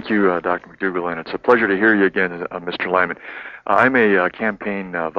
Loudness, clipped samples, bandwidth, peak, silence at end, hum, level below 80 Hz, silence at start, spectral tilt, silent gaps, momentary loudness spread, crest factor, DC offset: -18 LUFS; under 0.1%; 6.6 kHz; 0 dBFS; 0 s; none; -56 dBFS; 0 s; -7.5 dB/octave; none; 12 LU; 18 dB; under 0.1%